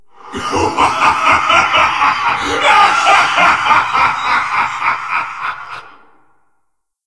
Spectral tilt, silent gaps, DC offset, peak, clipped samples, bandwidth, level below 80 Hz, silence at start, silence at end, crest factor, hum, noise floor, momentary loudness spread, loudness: -2 dB/octave; none; 0.7%; 0 dBFS; under 0.1%; 11 kHz; -44 dBFS; 0.25 s; 1.2 s; 14 dB; none; -66 dBFS; 14 LU; -12 LUFS